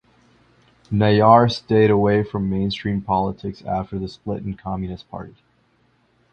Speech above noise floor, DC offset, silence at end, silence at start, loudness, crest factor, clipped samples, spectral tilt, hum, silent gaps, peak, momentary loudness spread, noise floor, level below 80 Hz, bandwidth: 42 dB; under 0.1%; 1.05 s; 0.9 s; -20 LUFS; 20 dB; under 0.1%; -8 dB/octave; none; none; 0 dBFS; 17 LU; -62 dBFS; -46 dBFS; 8.4 kHz